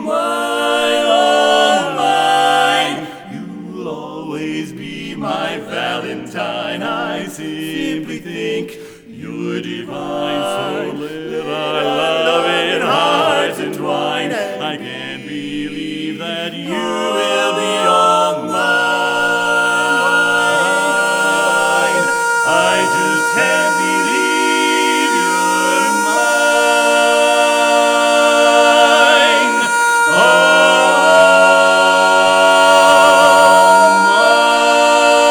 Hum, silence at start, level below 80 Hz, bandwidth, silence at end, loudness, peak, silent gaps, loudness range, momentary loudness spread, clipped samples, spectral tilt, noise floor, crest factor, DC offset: none; 0 s; -58 dBFS; over 20 kHz; 0 s; -13 LUFS; 0 dBFS; none; 13 LU; 15 LU; under 0.1%; -2.5 dB/octave; -34 dBFS; 12 dB; under 0.1%